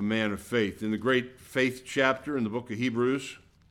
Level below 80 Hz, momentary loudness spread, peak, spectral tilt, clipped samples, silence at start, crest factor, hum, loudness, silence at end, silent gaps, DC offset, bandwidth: -62 dBFS; 6 LU; -8 dBFS; -5.5 dB/octave; under 0.1%; 0 s; 20 dB; none; -29 LUFS; 0.35 s; none; under 0.1%; 16.5 kHz